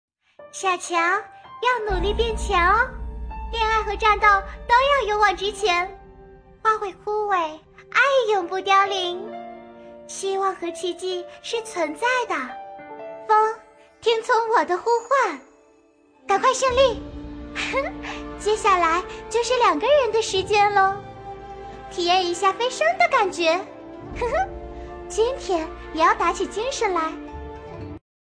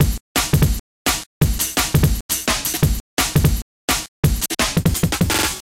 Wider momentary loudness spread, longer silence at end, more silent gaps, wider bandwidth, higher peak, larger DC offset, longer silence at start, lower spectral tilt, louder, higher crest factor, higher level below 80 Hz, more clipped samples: first, 19 LU vs 4 LU; first, 0.25 s vs 0.05 s; second, none vs 0.20-0.35 s, 0.80-1.05 s, 1.26-1.41 s, 2.21-2.29 s, 3.00-3.17 s, 3.62-3.88 s, 4.08-4.23 s; second, 11 kHz vs 17 kHz; about the same, -4 dBFS vs -4 dBFS; neither; first, 0.4 s vs 0 s; about the same, -3 dB/octave vs -4 dB/octave; about the same, -21 LUFS vs -19 LUFS; about the same, 18 dB vs 16 dB; second, -40 dBFS vs -26 dBFS; neither